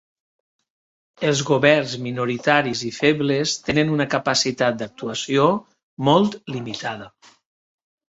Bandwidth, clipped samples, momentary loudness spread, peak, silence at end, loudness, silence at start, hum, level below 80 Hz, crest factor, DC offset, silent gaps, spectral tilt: 8.2 kHz; under 0.1%; 11 LU; -2 dBFS; 1 s; -20 LUFS; 1.2 s; none; -58 dBFS; 20 dB; under 0.1%; 5.83-5.97 s; -4.5 dB/octave